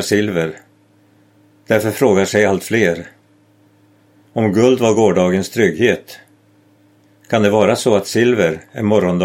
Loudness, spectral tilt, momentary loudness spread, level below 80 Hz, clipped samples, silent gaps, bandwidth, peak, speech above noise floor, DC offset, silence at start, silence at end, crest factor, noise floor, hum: -15 LUFS; -5.5 dB/octave; 7 LU; -56 dBFS; under 0.1%; none; 16.5 kHz; 0 dBFS; 38 dB; under 0.1%; 0 s; 0 s; 16 dB; -52 dBFS; none